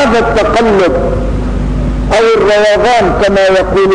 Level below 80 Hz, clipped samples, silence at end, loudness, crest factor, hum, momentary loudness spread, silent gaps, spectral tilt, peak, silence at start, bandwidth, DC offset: -20 dBFS; under 0.1%; 0 s; -9 LUFS; 6 dB; none; 7 LU; none; -5.5 dB/octave; -2 dBFS; 0 s; 10.5 kHz; under 0.1%